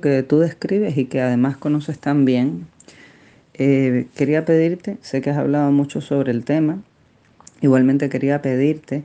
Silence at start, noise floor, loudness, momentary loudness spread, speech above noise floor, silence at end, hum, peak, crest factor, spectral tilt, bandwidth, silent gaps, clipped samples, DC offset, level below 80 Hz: 0.05 s; -55 dBFS; -19 LUFS; 6 LU; 37 dB; 0 s; none; -2 dBFS; 16 dB; -8.5 dB/octave; 9 kHz; none; under 0.1%; under 0.1%; -64 dBFS